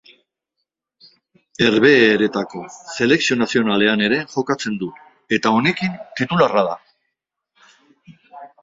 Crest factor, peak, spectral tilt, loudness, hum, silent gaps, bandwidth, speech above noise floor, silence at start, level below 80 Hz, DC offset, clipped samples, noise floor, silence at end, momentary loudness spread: 18 dB; 0 dBFS; -5 dB/octave; -17 LUFS; none; none; 7.8 kHz; 61 dB; 1.6 s; -58 dBFS; under 0.1%; under 0.1%; -78 dBFS; 0.15 s; 16 LU